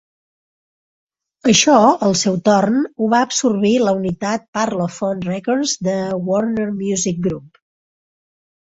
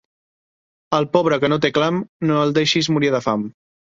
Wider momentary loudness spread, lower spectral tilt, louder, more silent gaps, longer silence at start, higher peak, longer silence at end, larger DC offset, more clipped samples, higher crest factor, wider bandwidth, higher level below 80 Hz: first, 10 LU vs 6 LU; second, -4 dB/octave vs -5.5 dB/octave; about the same, -17 LUFS vs -18 LUFS; second, 4.48-4.53 s vs 2.09-2.20 s; first, 1.45 s vs 0.9 s; about the same, 0 dBFS vs -2 dBFS; first, 1.25 s vs 0.45 s; neither; neither; about the same, 18 dB vs 18 dB; about the same, 8 kHz vs 7.8 kHz; about the same, -54 dBFS vs -58 dBFS